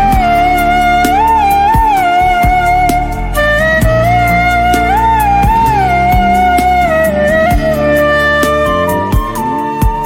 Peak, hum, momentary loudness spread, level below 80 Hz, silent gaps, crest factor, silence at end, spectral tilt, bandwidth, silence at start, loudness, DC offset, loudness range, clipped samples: 0 dBFS; none; 4 LU; -20 dBFS; none; 10 dB; 0 s; -5.5 dB/octave; 17 kHz; 0 s; -10 LUFS; under 0.1%; 1 LU; under 0.1%